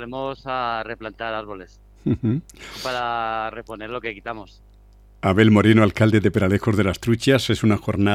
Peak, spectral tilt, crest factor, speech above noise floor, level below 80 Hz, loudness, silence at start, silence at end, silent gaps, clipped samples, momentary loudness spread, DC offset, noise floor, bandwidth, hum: -4 dBFS; -6.5 dB/octave; 18 dB; 29 dB; -46 dBFS; -21 LUFS; 0 s; 0 s; none; under 0.1%; 16 LU; under 0.1%; -49 dBFS; 14 kHz; 50 Hz at -45 dBFS